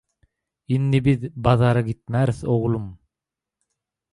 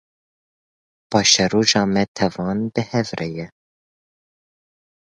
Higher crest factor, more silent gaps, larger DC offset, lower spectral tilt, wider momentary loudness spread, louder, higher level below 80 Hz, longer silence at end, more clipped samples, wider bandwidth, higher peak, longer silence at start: about the same, 20 dB vs 22 dB; second, none vs 2.08-2.15 s; neither; first, -8.5 dB/octave vs -3.5 dB/octave; second, 7 LU vs 14 LU; about the same, -21 LUFS vs -19 LUFS; first, -46 dBFS vs -54 dBFS; second, 1.15 s vs 1.6 s; neither; about the same, 11 kHz vs 11.5 kHz; about the same, -2 dBFS vs 0 dBFS; second, 0.7 s vs 1.1 s